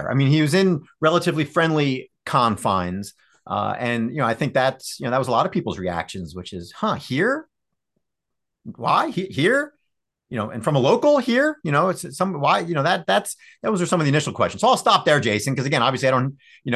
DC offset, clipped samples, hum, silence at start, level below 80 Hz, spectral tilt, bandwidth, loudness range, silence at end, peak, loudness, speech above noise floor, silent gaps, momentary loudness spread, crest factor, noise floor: under 0.1%; under 0.1%; none; 0 s; -54 dBFS; -5.5 dB/octave; 12.5 kHz; 5 LU; 0 s; -2 dBFS; -21 LUFS; 63 dB; none; 12 LU; 18 dB; -84 dBFS